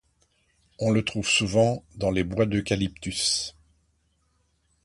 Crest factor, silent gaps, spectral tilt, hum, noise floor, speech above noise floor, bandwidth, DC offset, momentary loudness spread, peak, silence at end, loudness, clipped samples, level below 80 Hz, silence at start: 18 dB; none; -4 dB/octave; none; -69 dBFS; 44 dB; 11.5 kHz; under 0.1%; 7 LU; -8 dBFS; 1.35 s; -25 LUFS; under 0.1%; -48 dBFS; 0.8 s